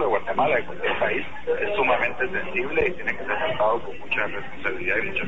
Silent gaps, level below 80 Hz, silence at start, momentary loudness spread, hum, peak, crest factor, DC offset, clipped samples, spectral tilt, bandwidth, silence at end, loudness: none; -50 dBFS; 0 s; 7 LU; none; -8 dBFS; 16 dB; 3%; under 0.1%; -6 dB/octave; 7.8 kHz; 0 s; -24 LUFS